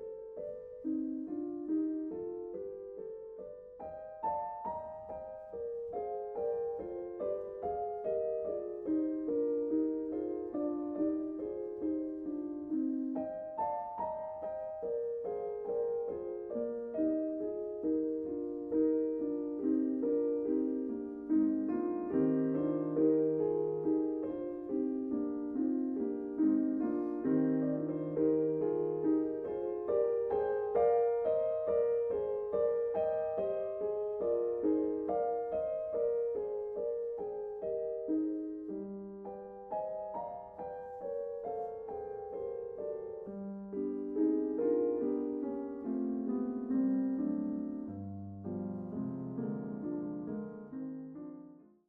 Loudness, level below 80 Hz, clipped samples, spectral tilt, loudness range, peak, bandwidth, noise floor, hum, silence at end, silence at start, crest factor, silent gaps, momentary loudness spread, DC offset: -36 LUFS; -70 dBFS; under 0.1%; -10 dB/octave; 8 LU; -20 dBFS; 3.2 kHz; -55 dBFS; none; 0.25 s; 0 s; 16 dB; none; 12 LU; under 0.1%